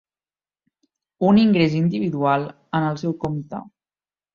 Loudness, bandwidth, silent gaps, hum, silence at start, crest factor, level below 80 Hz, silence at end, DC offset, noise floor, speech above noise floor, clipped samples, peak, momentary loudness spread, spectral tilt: -20 LUFS; 7 kHz; none; none; 1.2 s; 16 dB; -56 dBFS; 0.65 s; under 0.1%; under -90 dBFS; over 71 dB; under 0.1%; -6 dBFS; 13 LU; -8 dB/octave